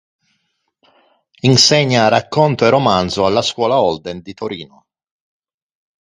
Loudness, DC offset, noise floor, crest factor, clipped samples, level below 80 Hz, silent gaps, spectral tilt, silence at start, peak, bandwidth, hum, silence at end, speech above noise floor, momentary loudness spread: -13 LUFS; under 0.1%; -68 dBFS; 16 dB; under 0.1%; -48 dBFS; none; -4.5 dB/octave; 1.45 s; 0 dBFS; 11 kHz; none; 1.35 s; 54 dB; 16 LU